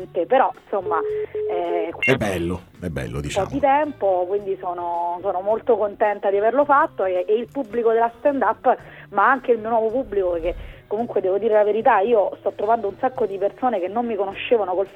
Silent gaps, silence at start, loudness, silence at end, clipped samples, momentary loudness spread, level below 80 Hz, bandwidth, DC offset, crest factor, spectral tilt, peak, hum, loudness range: none; 0 s; -21 LUFS; 0 s; under 0.1%; 9 LU; -48 dBFS; 13 kHz; under 0.1%; 18 dB; -6 dB/octave; -4 dBFS; none; 3 LU